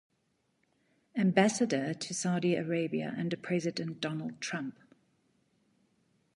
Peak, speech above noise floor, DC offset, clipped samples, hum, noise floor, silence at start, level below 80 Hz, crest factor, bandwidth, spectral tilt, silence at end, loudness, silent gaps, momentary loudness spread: -10 dBFS; 45 dB; under 0.1%; under 0.1%; none; -76 dBFS; 1.15 s; -78 dBFS; 24 dB; 11.5 kHz; -5 dB/octave; 1.65 s; -32 LUFS; none; 10 LU